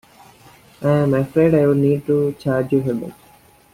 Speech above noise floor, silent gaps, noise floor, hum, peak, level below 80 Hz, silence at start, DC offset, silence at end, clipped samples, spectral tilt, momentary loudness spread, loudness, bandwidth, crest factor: 33 dB; none; -50 dBFS; none; -4 dBFS; -52 dBFS; 0.8 s; under 0.1%; 0.6 s; under 0.1%; -9 dB/octave; 10 LU; -18 LUFS; 15.5 kHz; 14 dB